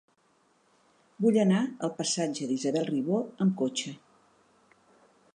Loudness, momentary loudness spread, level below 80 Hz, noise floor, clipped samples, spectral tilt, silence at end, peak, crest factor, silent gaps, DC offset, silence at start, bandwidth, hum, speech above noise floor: -28 LUFS; 8 LU; -80 dBFS; -68 dBFS; under 0.1%; -5 dB/octave; 1.4 s; -12 dBFS; 18 dB; none; under 0.1%; 1.2 s; 11 kHz; none; 40 dB